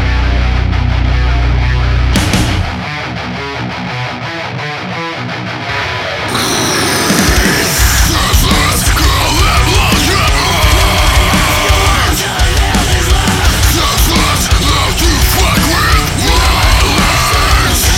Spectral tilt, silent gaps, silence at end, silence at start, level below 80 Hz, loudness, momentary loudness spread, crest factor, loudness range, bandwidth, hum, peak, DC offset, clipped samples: -3.5 dB/octave; none; 0 s; 0 s; -14 dBFS; -11 LUFS; 9 LU; 10 dB; 7 LU; 17 kHz; none; 0 dBFS; under 0.1%; under 0.1%